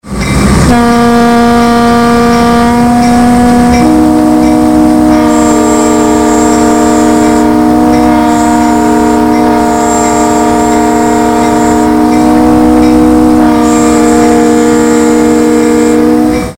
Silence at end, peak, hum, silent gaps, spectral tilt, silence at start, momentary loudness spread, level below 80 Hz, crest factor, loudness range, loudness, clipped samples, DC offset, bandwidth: 0.05 s; 0 dBFS; none; none; -5.5 dB/octave; 0.05 s; 2 LU; -24 dBFS; 6 dB; 1 LU; -6 LUFS; 0.4%; 2%; 16.5 kHz